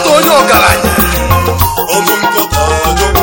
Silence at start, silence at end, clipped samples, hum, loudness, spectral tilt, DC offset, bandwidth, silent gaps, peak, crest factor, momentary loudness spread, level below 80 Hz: 0 s; 0 s; 0.4%; none; -9 LUFS; -3.5 dB/octave; under 0.1%; over 20 kHz; none; 0 dBFS; 8 dB; 5 LU; -20 dBFS